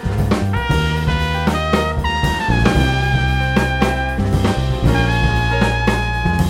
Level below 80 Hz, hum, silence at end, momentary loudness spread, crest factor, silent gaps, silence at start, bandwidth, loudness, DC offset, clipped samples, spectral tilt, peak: -22 dBFS; none; 0 s; 3 LU; 16 dB; none; 0 s; 16 kHz; -17 LUFS; under 0.1%; under 0.1%; -6 dB/octave; 0 dBFS